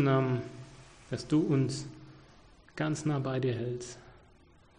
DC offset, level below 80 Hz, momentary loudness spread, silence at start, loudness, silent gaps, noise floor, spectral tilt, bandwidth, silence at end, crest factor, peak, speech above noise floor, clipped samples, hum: under 0.1%; -62 dBFS; 22 LU; 0 s; -32 LUFS; none; -60 dBFS; -6.5 dB/octave; 10 kHz; 0.65 s; 16 dB; -16 dBFS; 30 dB; under 0.1%; none